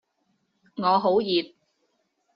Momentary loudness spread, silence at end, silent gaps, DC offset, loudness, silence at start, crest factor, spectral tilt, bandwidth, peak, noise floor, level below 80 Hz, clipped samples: 20 LU; 0.9 s; none; under 0.1%; -23 LUFS; 0.75 s; 18 dB; -3.5 dB/octave; 5.6 kHz; -8 dBFS; -73 dBFS; -70 dBFS; under 0.1%